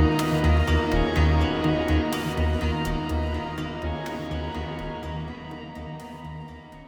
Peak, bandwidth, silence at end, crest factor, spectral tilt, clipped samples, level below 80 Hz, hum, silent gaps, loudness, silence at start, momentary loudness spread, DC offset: -8 dBFS; 19 kHz; 0 s; 16 dB; -6.5 dB/octave; under 0.1%; -30 dBFS; none; none; -25 LUFS; 0 s; 16 LU; under 0.1%